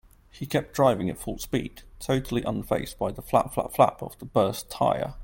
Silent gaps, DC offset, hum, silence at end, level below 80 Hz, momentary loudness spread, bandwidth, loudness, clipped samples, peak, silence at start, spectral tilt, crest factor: none; under 0.1%; none; 0 s; -48 dBFS; 10 LU; 17 kHz; -26 LUFS; under 0.1%; -6 dBFS; 0.35 s; -6 dB/octave; 22 dB